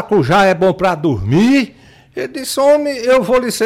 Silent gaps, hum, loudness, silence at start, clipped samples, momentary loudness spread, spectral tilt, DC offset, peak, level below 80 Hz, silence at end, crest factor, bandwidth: none; none; -13 LUFS; 0 s; under 0.1%; 13 LU; -5.5 dB/octave; under 0.1%; -4 dBFS; -42 dBFS; 0 s; 10 dB; 16.5 kHz